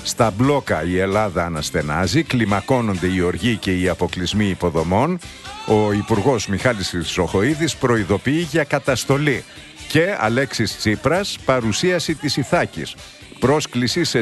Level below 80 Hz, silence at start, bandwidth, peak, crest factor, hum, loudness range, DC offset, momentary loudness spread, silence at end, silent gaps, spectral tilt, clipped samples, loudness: -42 dBFS; 0 s; 12.5 kHz; -2 dBFS; 16 dB; none; 1 LU; under 0.1%; 4 LU; 0 s; none; -5 dB/octave; under 0.1%; -19 LUFS